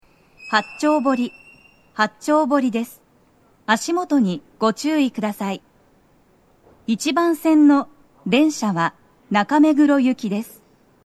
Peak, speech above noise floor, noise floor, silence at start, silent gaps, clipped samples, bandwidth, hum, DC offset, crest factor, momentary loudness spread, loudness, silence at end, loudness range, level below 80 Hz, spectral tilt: 0 dBFS; 38 dB; -56 dBFS; 0.4 s; none; under 0.1%; 13.5 kHz; none; under 0.1%; 20 dB; 15 LU; -19 LUFS; 0.6 s; 5 LU; -66 dBFS; -5 dB/octave